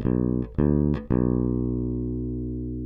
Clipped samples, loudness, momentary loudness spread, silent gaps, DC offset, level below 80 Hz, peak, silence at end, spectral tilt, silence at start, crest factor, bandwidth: under 0.1%; -26 LUFS; 8 LU; none; under 0.1%; -34 dBFS; -10 dBFS; 0 s; -13 dB/octave; 0 s; 14 dB; 3.7 kHz